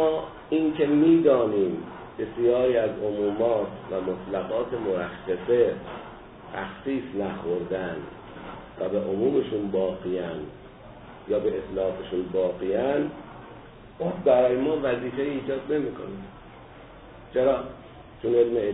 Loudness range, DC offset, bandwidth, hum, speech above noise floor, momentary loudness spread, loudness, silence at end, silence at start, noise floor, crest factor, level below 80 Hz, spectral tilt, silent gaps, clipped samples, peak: 6 LU; under 0.1%; 4 kHz; none; 21 dB; 22 LU; -26 LUFS; 0 s; 0 s; -46 dBFS; 18 dB; -54 dBFS; -11 dB/octave; none; under 0.1%; -8 dBFS